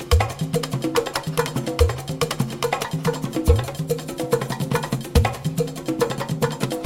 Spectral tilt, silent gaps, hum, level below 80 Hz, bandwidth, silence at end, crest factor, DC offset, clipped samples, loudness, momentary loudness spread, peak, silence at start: -5.5 dB/octave; none; none; -30 dBFS; 17 kHz; 0 s; 20 dB; under 0.1%; under 0.1%; -23 LUFS; 5 LU; -4 dBFS; 0 s